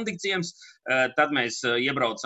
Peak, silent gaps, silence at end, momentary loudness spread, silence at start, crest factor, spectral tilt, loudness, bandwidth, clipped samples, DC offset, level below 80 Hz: -8 dBFS; none; 0 s; 8 LU; 0 s; 18 dB; -3.5 dB/octave; -25 LUFS; 8.6 kHz; under 0.1%; under 0.1%; -70 dBFS